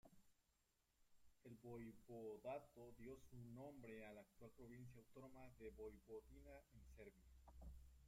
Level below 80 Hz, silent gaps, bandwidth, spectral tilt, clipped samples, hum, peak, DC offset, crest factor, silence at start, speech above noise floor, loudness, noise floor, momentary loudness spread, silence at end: -72 dBFS; none; 16 kHz; -7 dB/octave; under 0.1%; none; -42 dBFS; under 0.1%; 18 dB; 0.05 s; 26 dB; -61 LUFS; -86 dBFS; 10 LU; 0 s